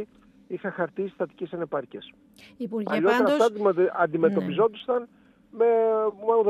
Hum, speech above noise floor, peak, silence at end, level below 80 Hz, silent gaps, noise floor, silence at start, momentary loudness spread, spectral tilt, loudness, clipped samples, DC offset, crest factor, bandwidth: none; 20 dB; -8 dBFS; 0 s; -72 dBFS; none; -45 dBFS; 0 s; 13 LU; -6.5 dB/octave; -25 LUFS; under 0.1%; under 0.1%; 16 dB; 12.5 kHz